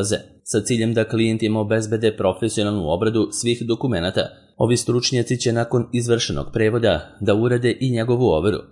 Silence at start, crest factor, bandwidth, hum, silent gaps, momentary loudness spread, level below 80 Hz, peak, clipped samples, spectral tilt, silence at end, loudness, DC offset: 0 s; 16 dB; 11.5 kHz; none; none; 5 LU; -46 dBFS; -4 dBFS; under 0.1%; -5.5 dB/octave; 0.05 s; -20 LUFS; under 0.1%